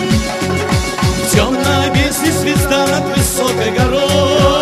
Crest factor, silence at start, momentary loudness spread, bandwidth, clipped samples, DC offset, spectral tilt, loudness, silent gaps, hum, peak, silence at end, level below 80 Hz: 14 dB; 0 s; 3 LU; 14.5 kHz; under 0.1%; under 0.1%; -4.5 dB/octave; -13 LUFS; none; none; 0 dBFS; 0 s; -26 dBFS